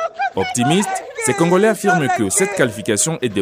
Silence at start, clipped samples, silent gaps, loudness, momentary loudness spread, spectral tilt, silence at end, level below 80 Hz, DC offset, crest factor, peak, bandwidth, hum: 0 s; under 0.1%; none; -17 LUFS; 6 LU; -4 dB/octave; 0 s; -56 dBFS; under 0.1%; 16 dB; -2 dBFS; 16 kHz; none